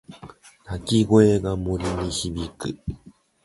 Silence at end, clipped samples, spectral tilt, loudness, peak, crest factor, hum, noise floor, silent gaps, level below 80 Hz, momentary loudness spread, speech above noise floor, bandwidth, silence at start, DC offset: 0.35 s; under 0.1%; -6 dB/octave; -22 LUFS; -4 dBFS; 20 dB; none; -46 dBFS; none; -40 dBFS; 21 LU; 24 dB; 11.5 kHz; 0.1 s; under 0.1%